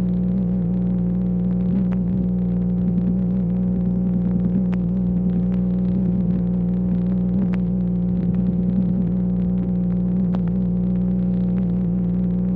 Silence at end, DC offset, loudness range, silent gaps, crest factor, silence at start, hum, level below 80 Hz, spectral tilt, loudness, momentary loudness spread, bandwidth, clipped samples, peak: 0 s; under 0.1%; 0 LU; none; 10 dB; 0 s; 60 Hz at -30 dBFS; -34 dBFS; -13 dB/octave; -21 LUFS; 1 LU; 2.8 kHz; under 0.1%; -10 dBFS